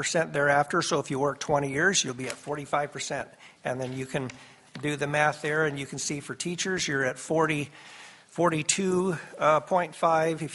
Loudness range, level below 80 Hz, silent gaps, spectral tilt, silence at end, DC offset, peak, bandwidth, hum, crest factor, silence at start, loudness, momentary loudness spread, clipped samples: 4 LU; -64 dBFS; none; -3.5 dB/octave; 0 s; under 0.1%; -8 dBFS; 11.5 kHz; none; 20 dB; 0 s; -27 LUFS; 11 LU; under 0.1%